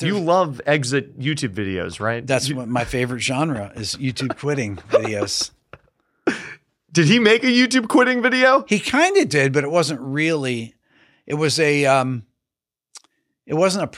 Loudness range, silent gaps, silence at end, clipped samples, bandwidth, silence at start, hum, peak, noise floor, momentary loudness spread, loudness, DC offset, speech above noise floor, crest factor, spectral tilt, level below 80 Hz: 7 LU; none; 0 s; under 0.1%; 15 kHz; 0 s; none; -2 dBFS; -87 dBFS; 11 LU; -19 LUFS; under 0.1%; 68 dB; 18 dB; -4.5 dB/octave; -52 dBFS